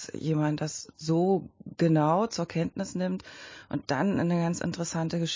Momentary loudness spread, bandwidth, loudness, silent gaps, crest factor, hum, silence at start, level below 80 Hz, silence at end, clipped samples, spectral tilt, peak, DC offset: 11 LU; 7.6 kHz; -29 LUFS; none; 14 dB; none; 0 s; -60 dBFS; 0 s; under 0.1%; -6 dB/octave; -14 dBFS; under 0.1%